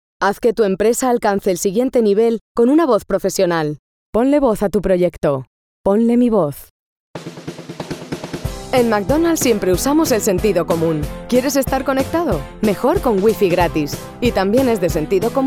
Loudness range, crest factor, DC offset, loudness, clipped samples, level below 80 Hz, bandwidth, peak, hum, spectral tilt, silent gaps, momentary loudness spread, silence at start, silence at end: 4 LU; 14 dB; under 0.1%; -17 LUFS; under 0.1%; -36 dBFS; over 20 kHz; -2 dBFS; none; -5.5 dB/octave; 2.41-2.55 s, 3.79-4.13 s, 5.47-5.84 s, 6.70-7.14 s; 13 LU; 0.2 s; 0 s